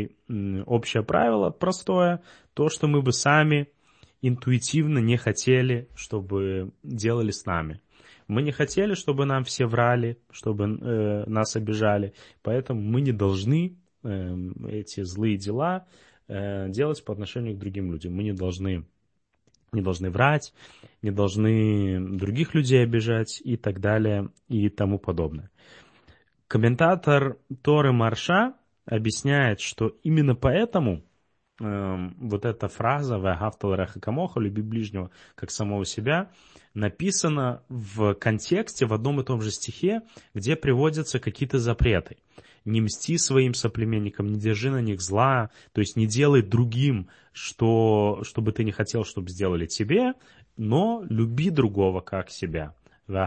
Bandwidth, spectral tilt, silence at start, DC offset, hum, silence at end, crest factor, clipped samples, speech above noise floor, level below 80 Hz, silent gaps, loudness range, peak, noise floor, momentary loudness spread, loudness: 8.8 kHz; -6 dB/octave; 0 s; under 0.1%; none; 0 s; 22 dB; under 0.1%; 49 dB; -48 dBFS; none; 5 LU; -4 dBFS; -74 dBFS; 11 LU; -25 LUFS